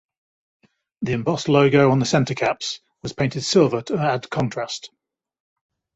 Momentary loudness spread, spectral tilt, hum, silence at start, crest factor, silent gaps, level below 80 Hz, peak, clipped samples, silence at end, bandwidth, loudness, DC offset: 14 LU; -5.5 dB/octave; none; 1 s; 18 dB; none; -56 dBFS; -4 dBFS; under 0.1%; 1.1 s; 8.2 kHz; -20 LUFS; under 0.1%